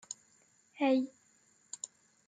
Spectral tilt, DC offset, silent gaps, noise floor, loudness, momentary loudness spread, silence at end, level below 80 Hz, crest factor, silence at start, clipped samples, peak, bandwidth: -2.5 dB/octave; under 0.1%; none; -69 dBFS; -35 LUFS; 17 LU; 0.4 s; under -90 dBFS; 18 dB; 0.1 s; under 0.1%; -18 dBFS; 9.6 kHz